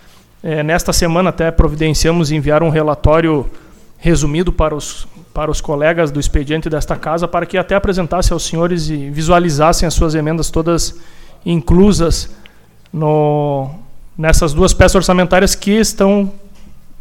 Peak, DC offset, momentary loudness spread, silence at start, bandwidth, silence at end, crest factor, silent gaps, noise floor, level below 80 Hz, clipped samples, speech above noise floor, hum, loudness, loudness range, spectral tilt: 0 dBFS; under 0.1%; 11 LU; 0.4 s; 16.5 kHz; 0.1 s; 14 dB; none; -40 dBFS; -22 dBFS; under 0.1%; 27 dB; none; -14 LUFS; 4 LU; -5 dB/octave